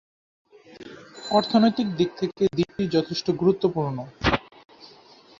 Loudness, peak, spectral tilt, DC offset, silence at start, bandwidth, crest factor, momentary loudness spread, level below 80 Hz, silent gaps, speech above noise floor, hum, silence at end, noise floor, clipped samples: -24 LUFS; -6 dBFS; -6.5 dB/octave; under 0.1%; 0.8 s; 7.6 kHz; 20 dB; 19 LU; -48 dBFS; none; 29 dB; none; 0.5 s; -51 dBFS; under 0.1%